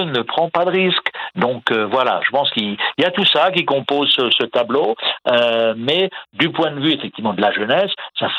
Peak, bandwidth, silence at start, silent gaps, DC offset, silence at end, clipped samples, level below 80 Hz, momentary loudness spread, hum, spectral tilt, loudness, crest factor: 0 dBFS; 10 kHz; 0 s; none; under 0.1%; 0 s; under 0.1%; -68 dBFS; 6 LU; none; -6 dB/octave; -17 LUFS; 18 dB